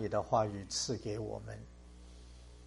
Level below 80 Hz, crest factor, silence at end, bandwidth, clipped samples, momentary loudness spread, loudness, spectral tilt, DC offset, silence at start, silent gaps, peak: -56 dBFS; 20 dB; 0 s; 11.5 kHz; under 0.1%; 23 LU; -36 LUFS; -4.5 dB/octave; under 0.1%; 0 s; none; -18 dBFS